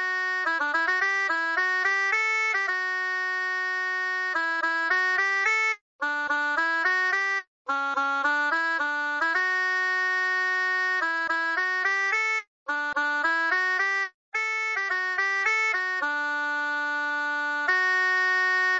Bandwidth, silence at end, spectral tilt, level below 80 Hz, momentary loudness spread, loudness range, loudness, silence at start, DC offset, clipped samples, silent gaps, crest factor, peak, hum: 8 kHz; 0 s; 0.5 dB/octave; -74 dBFS; 5 LU; 1 LU; -24 LUFS; 0 s; under 0.1%; under 0.1%; 5.81-5.99 s, 7.47-7.65 s, 12.47-12.66 s, 14.14-14.32 s; 14 dB; -12 dBFS; none